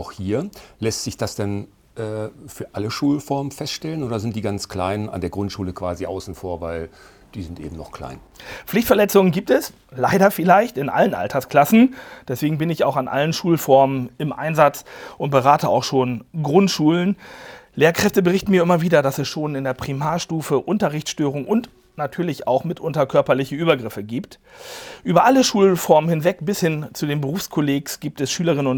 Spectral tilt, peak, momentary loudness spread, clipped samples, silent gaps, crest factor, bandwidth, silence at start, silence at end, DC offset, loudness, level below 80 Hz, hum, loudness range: -5.5 dB/octave; 0 dBFS; 18 LU; under 0.1%; none; 20 dB; over 20 kHz; 0 s; 0 s; under 0.1%; -20 LUFS; -52 dBFS; none; 8 LU